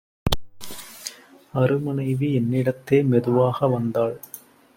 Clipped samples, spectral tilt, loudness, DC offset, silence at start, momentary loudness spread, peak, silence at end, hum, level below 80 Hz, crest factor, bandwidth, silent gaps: under 0.1%; -7 dB/octave; -22 LUFS; under 0.1%; 0.25 s; 18 LU; -2 dBFS; 0.4 s; none; -44 dBFS; 22 dB; 16.5 kHz; none